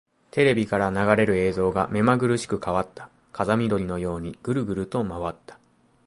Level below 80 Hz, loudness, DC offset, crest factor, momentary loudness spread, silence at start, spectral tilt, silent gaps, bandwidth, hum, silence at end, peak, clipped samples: -48 dBFS; -24 LUFS; under 0.1%; 22 dB; 10 LU; 0.35 s; -6.5 dB/octave; none; 11.5 kHz; none; 0.55 s; -2 dBFS; under 0.1%